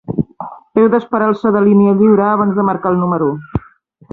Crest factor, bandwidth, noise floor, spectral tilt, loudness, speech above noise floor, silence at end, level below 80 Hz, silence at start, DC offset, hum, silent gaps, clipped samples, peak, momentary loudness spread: 14 dB; 4.2 kHz; -46 dBFS; -11 dB/octave; -13 LUFS; 34 dB; 0.55 s; -44 dBFS; 0.1 s; under 0.1%; none; none; under 0.1%; 0 dBFS; 13 LU